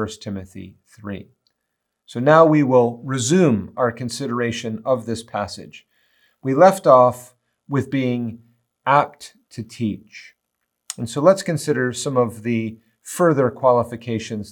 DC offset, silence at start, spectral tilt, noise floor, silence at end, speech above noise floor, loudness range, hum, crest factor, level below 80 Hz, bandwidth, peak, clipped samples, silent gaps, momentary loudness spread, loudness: under 0.1%; 0 s; -6 dB/octave; -77 dBFS; 0 s; 58 dB; 6 LU; none; 20 dB; -64 dBFS; 18 kHz; 0 dBFS; under 0.1%; none; 20 LU; -19 LUFS